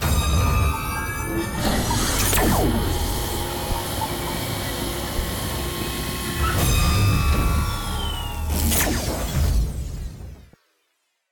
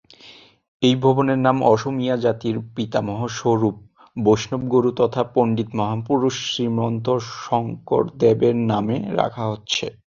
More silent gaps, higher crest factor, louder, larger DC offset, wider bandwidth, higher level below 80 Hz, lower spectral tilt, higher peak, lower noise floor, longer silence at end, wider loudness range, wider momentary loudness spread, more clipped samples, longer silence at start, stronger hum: second, none vs 0.68-0.80 s; about the same, 16 dB vs 18 dB; about the same, -23 LUFS vs -21 LUFS; neither; first, 17.5 kHz vs 7.4 kHz; first, -26 dBFS vs -56 dBFS; second, -4 dB/octave vs -6 dB/octave; second, -8 dBFS vs -2 dBFS; first, -71 dBFS vs -47 dBFS; first, 0.9 s vs 0.25 s; first, 4 LU vs 1 LU; about the same, 7 LU vs 7 LU; neither; second, 0 s vs 0.25 s; neither